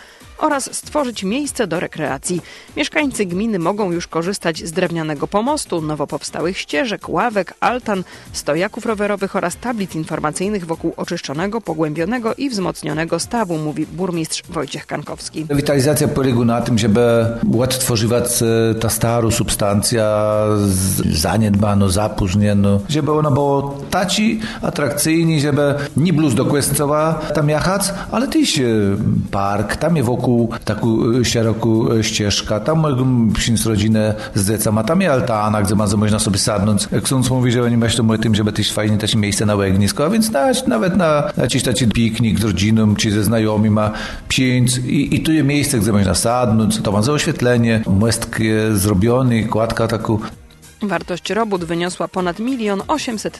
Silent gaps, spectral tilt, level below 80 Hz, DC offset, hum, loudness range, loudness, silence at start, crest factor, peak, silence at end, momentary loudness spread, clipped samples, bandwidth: none; -5 dB/octave; -38 dBFS; under 0.1%; none; 5 LU; -17 LUFS; 0 s; 16 dB; 0 dBFS; 0 s; 7 LU; under 0.1%; 13 kHz